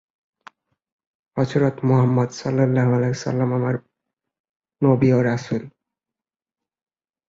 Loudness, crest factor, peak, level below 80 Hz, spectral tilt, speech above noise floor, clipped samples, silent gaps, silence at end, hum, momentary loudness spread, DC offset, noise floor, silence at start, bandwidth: -20 LUFS; 18 dB; -4 dBFS; -58 dBFS; -8 dB/octave; 71 dB; under 0.1%; 4.40-4.44 s, 4.56-4.60 s; 1.6 s; none; 9 LU; under 0.1%; -90 dBFS; 1.35 s; 7.6 kHz